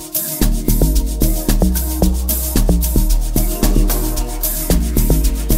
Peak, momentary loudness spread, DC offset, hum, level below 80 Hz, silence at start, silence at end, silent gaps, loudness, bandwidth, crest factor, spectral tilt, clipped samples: -2 dBFS; 3 LU; under 0.1%; none; -16 dBFS; 0 s; 0 s; none; -17 LUFS; 16.5 kHz; 12 dB; -5 dB/octave; under 0.1%